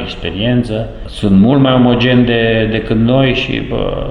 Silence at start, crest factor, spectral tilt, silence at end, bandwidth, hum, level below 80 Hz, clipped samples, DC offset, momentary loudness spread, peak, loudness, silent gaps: 0 s; 12 dB; -8 dB/octave; 0 s; 10 kHz; none; -28 dBFS; under 0.1%; under 0.1%; 10 LU; 0 dBFS; -12 LUFS; none